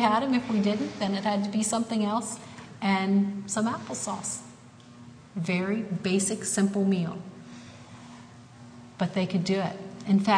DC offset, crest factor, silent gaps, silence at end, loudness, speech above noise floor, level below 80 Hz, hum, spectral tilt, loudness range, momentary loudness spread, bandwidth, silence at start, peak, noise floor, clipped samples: under 0.1%; 18 dB; none; 0 s; -28 LUFS; 23 dB; -68 dBFS; none; -5 dB/octave; 3 LU; 21 LU; 10.5 kHz; 0 s; -10 dBFS; -49 dBFS; under 0.1%